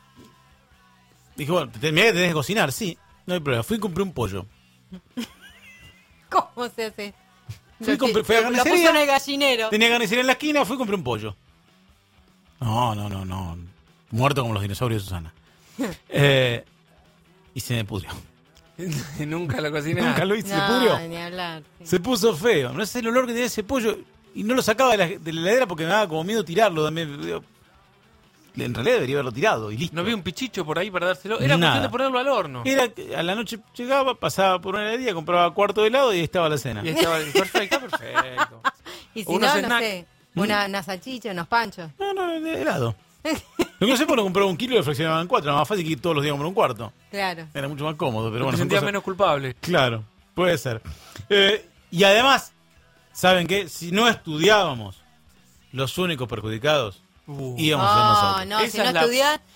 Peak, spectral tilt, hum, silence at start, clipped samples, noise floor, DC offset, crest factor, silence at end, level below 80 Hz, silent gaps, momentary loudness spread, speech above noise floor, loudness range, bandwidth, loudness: -4 dBFS; -4.5 dB/octave; none; 0.2 s; under 0.1%; -58 dBFS; under 0.1%; 20 dB; 0.2 s; -54 dBFS; none; 14 LU; 35 dB; 7 LU; 16.5 kHz; -22 LUFS